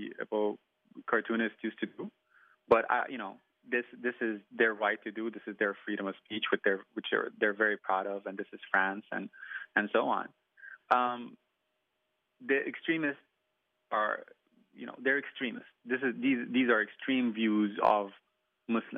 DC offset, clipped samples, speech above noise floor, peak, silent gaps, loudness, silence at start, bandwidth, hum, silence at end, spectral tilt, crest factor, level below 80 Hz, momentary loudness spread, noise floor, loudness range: under 0.1%; under 0.1%; 49 dB; -12 dBFS; none; -32 LUFS; 0 s; 5.4 kHz; none; 0 s; -2.5 dB/octave; 22 dB; -78 dBFS; 14 LU; -81 dBFS; 4 LU